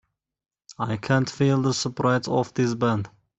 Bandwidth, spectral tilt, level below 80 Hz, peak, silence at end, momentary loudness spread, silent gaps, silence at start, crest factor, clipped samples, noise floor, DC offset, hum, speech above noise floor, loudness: 8.2 kHz; -6 dB/octave; -60 dBFS; -6 dBFS; 0.3 s; 8 LU; none; 0.7 s; 18 dB; under 0.1%; under -90 dBFS; under 0.1%; none; over 67 dB; -24 LUFS